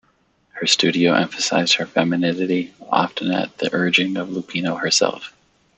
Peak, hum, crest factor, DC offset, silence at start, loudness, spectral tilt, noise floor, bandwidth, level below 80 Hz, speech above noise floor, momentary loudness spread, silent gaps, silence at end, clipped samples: 0 dBFS; none; 20 dB; under 0.1%; 0.55 s; -19 LUFS; -3.5 dB/octave; -62 dBFS; 8.4 kHz; -64 dBFS; 42 dB; 8 LU; none; 0.5 s; under 0.1%